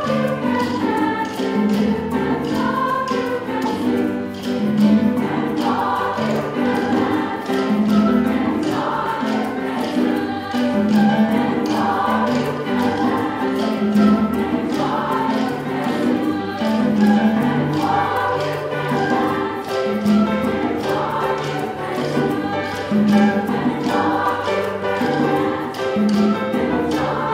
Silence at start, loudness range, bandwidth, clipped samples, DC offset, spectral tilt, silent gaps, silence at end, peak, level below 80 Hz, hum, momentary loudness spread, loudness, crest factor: 0 s; 2 LU; 15.5 kHz; under 0.1%; under 0.1%; -6.5 dB/octave; none; 0 s; -2 dBFS; -52 dBFS; none; 6 LU; -19 LUFS; 16 dB